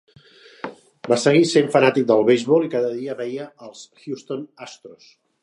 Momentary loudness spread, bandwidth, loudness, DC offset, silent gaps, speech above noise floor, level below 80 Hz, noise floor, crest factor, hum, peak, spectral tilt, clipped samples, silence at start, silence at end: 23 LU; 11.5 kHz; -18 LUFS; under 0.1%; none; 30 dB; -72 dBFS; -49 dBFS; 20 dB; none; -2 dBFS; -5.5 dB/octave; under 0.1%; 0.65 s; 0.5 s